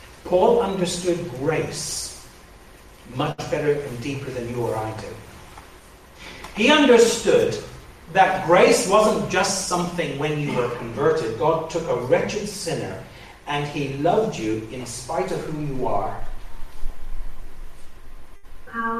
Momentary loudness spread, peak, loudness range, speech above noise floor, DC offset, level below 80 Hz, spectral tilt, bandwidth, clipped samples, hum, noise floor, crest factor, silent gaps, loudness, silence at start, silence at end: 24 LU; -4 dBFS; 11 LU; 25 dB; under 0.1%; -38 dBFS; -4.5 dB/octave; 15 kHz; under 0.1%; none; -46 dBFS; 20 dB; none; -21 LUFS; 0 s; 0 s